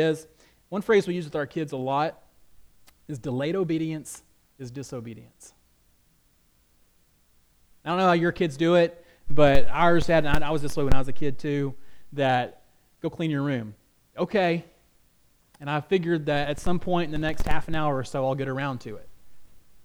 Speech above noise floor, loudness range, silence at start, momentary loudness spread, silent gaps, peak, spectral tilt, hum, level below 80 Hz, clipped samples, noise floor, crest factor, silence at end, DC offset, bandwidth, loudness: 42 dB; 10 LU; 0 s; 17 LU; none; -4 dBFS; -6.5 dB/octave; none; -38 dBFS; under 0.1%; -63 dBFS; 20 dB; 0.25 s; under 0.1%; 14 kHz; -26 LUFS